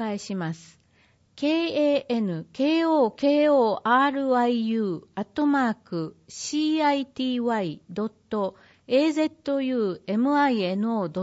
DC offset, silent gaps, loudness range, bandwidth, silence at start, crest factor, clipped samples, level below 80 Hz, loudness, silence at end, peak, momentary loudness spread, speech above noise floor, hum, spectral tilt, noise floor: under 0.1%; none; 4 LU; 8 kHz; 0 s; 16 dB; under 0.1%; -70 dBFS; -25 LUFS; 0 s; -10 dBFS; 11 LU; 38 dB; none; -5.5 dB/octave; -62 dBFS